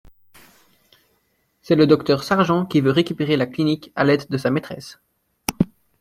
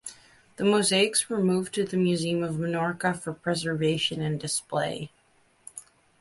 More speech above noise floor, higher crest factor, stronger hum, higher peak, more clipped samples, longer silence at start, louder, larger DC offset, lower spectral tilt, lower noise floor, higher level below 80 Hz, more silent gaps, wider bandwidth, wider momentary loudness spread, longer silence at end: first, 48 dB vs 38 dB; about the same, 20 dB vs 18 dB; neither; first, -2 dBFS vs -10 dBFS; neither; first, 1.7 s vs 0.05 s; first, -20 LUFS vs -26 LUFS; neither; first, -6.5 dB/octave vs -4 dB/octave; about the same, -67 dBFS vs -64 dBFS; first, -54 dBFS vs -64 dBFS; neither; first, 16.5 kHz vs 11.5 kHz; second, 13 LU vs 19 LU; about the same, 0.35 s vs 0.4 s